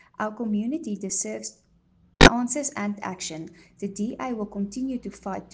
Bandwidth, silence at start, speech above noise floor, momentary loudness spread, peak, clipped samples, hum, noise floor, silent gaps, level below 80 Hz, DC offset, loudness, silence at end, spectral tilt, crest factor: 10 kHz; 0.2 s; 31 dB; 19 LU; -2 dBFS; under 0.1%; none; -61 dBFS; none; -38 dBFS; under 0.1%; -25 LUFS; 0.05 s; -4 dB/octave; 24 dB